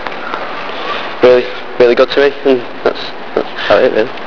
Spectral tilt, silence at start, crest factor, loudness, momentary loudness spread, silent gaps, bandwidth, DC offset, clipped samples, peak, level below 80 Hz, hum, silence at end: -5.5 dB/octave; 0 s; 14 dB; -13 LUFS; 12 LU; none; 5.4 kHz; 5%; 0.4%; 0 dBFS; -46 dBFS; none; 0 s